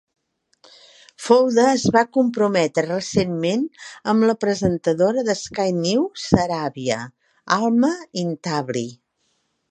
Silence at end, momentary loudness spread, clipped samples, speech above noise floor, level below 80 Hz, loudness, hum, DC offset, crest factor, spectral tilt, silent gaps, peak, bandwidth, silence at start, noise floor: 0.75 s; 10 LU; under 0.1%; 50 dB; -52 dBFS; -20 LUFS; none; under 0.1%; 20 dB; -5.5 dB/octave; none; 0 dBFS; 11 kHz; 1.2 s; -69 dBFS